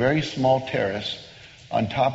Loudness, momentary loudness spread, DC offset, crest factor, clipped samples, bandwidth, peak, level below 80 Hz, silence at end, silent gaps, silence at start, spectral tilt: -24 LUFS; 16 LU; under 0.1%; 16 dB; under 0.1%; 8 kHz; -8 dBFS; -52 dBFS; 0 s; none; 0 s; -4 dB/octave